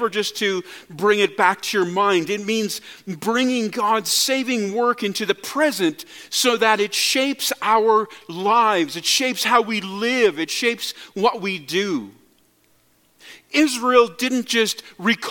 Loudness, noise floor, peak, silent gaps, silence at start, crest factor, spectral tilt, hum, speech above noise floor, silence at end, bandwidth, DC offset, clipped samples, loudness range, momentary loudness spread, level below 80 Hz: -20 LUFS; -60 dBFS; -2 dBFS; none; 0 s; 20 dB; -2.5 dB/octave; none; 40 dB; 0 s; 17.5 kHz; under 0.1%; under 0.1%; 4 LU; 8 LU; -70 dBFS